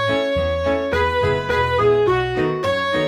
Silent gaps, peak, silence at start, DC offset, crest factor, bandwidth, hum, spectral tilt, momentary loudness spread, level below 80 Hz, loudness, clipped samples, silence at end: none; -6 dBFS; 0 s; under 0.1%; 12 dB; 13 kHz; none; -6 dB/octave; 4 LU; -36 dBFS; -19 LUFS; under 0.1%; 0 s